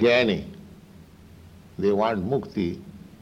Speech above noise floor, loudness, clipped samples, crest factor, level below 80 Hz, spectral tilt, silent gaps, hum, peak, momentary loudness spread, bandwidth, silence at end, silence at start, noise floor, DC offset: 25 dB; -25 LUFS; under 0.1%; 16 dB; -54 dBFS; -6.5 dB/octave; none; none; -10 dBFS; 22 LU; 15.5 kHz; 0.2 s; 0 s; -48 dBFS; under 0.1%